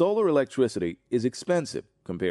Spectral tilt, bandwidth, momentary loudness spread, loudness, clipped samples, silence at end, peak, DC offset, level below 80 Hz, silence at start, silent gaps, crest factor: -6 dB/octave; 11.5 kHz; 13 LU; -26 LUFS; under 0.1%; 0 s; -12 dBFS; under 0.1%; -64 dBFS; 0 s; none; 14 dB